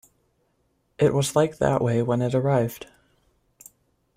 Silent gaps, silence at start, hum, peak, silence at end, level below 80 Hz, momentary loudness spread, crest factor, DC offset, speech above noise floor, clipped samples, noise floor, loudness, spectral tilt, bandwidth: none; 1 s; none; -8 dBFS; 1.35 s; -54 dBFS; 3 LU; 18 dB; under 0.1%; 47 dB; under 0.1%; -69 dBFS; -23 LUFS; -6.5 dB/octave; 16 kHz